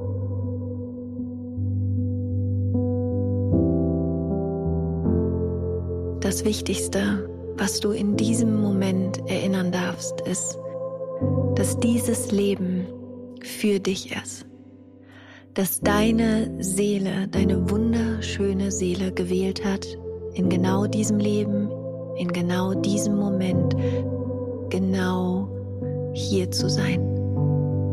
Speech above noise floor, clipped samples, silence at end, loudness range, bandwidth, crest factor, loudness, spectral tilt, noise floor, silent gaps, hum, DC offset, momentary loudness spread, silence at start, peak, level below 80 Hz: 24 dB; under 0.1%; 0 s; 2 LU; 15 kHz; 16 dB; -24 LUFS; -6 dB/octave; -47 dBFS; none; none; under 0.1%; 10 LU; 0 s; -8 dBFS; -44 dBFS